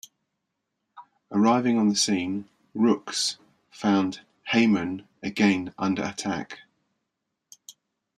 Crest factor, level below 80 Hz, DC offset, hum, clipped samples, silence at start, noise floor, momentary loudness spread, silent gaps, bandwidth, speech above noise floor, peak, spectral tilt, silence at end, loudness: 20 dB; -68 dBFS; under 0.1%; none; under 0.1%; 0.95 s; -81 dBFS; 13 LU; none; 12.5 kHz; 57 dB; -8 dBFS; -4 dB/octave; 0.45 s; -25 LUFS